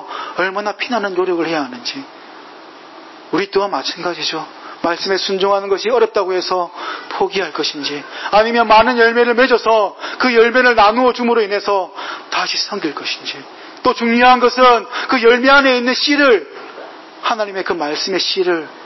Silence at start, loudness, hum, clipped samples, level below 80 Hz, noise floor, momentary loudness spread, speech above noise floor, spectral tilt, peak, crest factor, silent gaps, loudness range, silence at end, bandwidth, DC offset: 0 s; -15 LUFS; none; under 0.1%; -52 dBFS; -37 dBFS; 14 LU; 23 dB; -3.5 dB/octave; -2 dBFS; 14 dB; none; 9 LU; 0 s; 6.2 kHz; under 0.1%